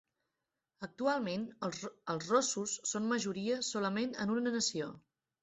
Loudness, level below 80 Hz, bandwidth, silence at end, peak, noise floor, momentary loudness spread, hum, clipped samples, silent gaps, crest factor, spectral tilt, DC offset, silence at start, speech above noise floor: -35 LUFS; -76 dBFS; 8.2 kHz; 0.45 s; -18 dBFS; -88 dBFS; 10 LU; none; under 0.1%; none; 18 dB; -3.5 dB/octave; under 0.1%; 0.8 s; 53 dB